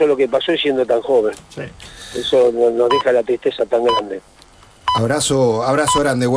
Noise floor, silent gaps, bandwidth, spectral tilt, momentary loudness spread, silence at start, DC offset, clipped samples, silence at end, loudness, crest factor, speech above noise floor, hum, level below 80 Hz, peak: -46 dBFS; none; 11 kHz; -4.5 dB/octave; 15 LU; 0 s; under 0.1%; under 0.1%; 0 s; -16 LUFS; 12 dB; 30 dB; none; -46 dBFS; -4 dBFS